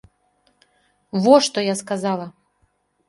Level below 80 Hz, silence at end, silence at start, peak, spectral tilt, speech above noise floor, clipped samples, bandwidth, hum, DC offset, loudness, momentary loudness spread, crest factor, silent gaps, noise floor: -66 dBFS; 0.8 s; 1.15 s; 0 dBFS; -4.5 dB/octave; 48 dB; under 0.1%; 11.5 kHz; none; under 0.1%; -19 LUFS; 14 LU; 22 dB; none; -66 dBFS